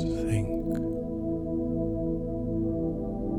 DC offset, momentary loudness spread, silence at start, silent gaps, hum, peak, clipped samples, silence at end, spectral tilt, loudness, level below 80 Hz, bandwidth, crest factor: under 0.1%; 3 LU; 0 s; none; none; -14 dBFS; under 0.1%; 0 s; -8.5 dB/octave; -30 LUFS; -40 dBFS; 11.5 kHz; 14 dB